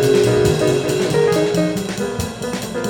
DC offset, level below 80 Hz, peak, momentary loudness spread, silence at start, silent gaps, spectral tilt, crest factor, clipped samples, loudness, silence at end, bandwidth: under 0.1%; -42 dBFS; -4 dBFS; 9 LU; 0 s; none; -5.5 dB/octave; 14 dB; under 0.1%; -18 LUFS; 0 s; 18.5 kHz